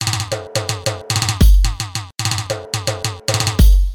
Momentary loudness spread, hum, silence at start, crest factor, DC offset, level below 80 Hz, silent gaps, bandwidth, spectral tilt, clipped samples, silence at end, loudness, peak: 9 LU; none; 0 s; 14 dB; under 0.1%; -18 dBFS; none; 19.5 kHz; -4 dB/octave; under 0.1%; 0 s; -18 LUFS; 0 dBFS